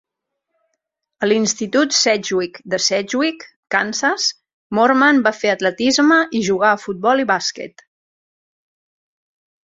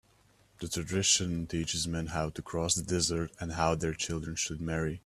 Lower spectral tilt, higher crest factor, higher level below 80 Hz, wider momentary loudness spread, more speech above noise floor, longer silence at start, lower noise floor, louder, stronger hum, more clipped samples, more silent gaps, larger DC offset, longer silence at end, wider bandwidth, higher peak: about the same, -2.5 dB/octave vs -3.5 dB/octave; about the same, 18 dB vs 20 dB; second, -62 dBFS vs -52 dBFS; about the same, 10 LU vs 9 LU; first, 62 dB vs 33 dB; first, 1.2 s vs 0.6 s; first, -79 dBFS vs -65 dBFS; first, -17 LUFS vs -31 LUFS; neither; neither; first, 3.56-3.63 s, 4.54-4.70 s vs none; neither; first, 1.95 s vs 0.05 s; second, 7.8 kHz vs 14 kHz; first, -2 dBFS vs -12 dBFS